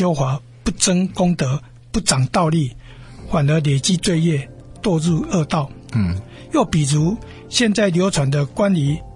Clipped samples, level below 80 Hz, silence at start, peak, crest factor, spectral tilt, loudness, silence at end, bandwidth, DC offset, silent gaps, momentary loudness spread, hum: under 0.1%; -40 dBFS; 0 s; -2 dBFS; 18 dB; -5 dB/octave; -19 LUFS; 0.05 s; 11.5 kHz; under 0.1%; none; 8 LU; none